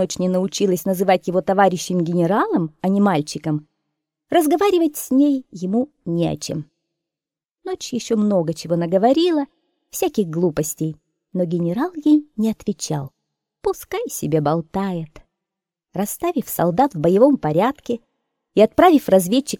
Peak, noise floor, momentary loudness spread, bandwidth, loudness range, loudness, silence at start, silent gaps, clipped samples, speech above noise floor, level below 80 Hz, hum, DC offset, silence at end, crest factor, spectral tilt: -2 dBFS; -89 dBFS; 12 LU; 17.5 kHz; 5 LU; -19 LUFS; 0 s; 7.51-7.55 s; under 0.1%; 70 dB; -54 dBFS; none; under 0.1%; 0.05 s; 18 dB; -6 dB/octave